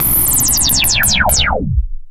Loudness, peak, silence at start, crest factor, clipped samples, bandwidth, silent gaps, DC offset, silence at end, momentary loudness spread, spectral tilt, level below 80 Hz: -11 LUFS; 0 dBFS; 0 s; 12 dB; under 0.1%; 17 kHz; none; under 0.1%; 0 s; 9 LU; -1.5 dB/octave; -22 dBFS